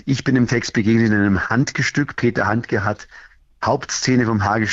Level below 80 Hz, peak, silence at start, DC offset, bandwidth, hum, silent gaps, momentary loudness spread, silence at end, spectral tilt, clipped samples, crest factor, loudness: -48 dBFS; -6 dBFS; 0.05 s; under 0.1%; 8 kHz; none; none; 5 LU; 0 s; -5.5 dB/octave; under 0.1%; 12 dB; -18 LUFS